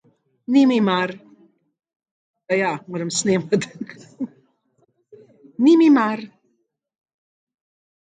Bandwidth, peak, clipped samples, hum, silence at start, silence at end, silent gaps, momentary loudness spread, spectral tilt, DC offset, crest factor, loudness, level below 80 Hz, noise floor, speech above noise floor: 9.4 kHz; -6 dBFS; under 0.1%; none; 0.5 s; 1.85 s; 1.96-2.00 s, 2.11-2.34 s; 21 LU; -5 dB/octave; under 0.1%; 16 dB; -19 LUFS; -72 dBFS; -71 dBFS; 52 dB